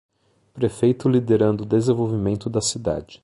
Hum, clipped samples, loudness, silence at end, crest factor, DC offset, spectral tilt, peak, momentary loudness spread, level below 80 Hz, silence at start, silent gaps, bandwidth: none; under 0.1%; -21 LUFS; 0.1 s; 16 dB; under 0.1%; -6 dB/octave; -6 dBFS; 7 LU; -48 dBFS; 0.55 s; none; 11.5 kHz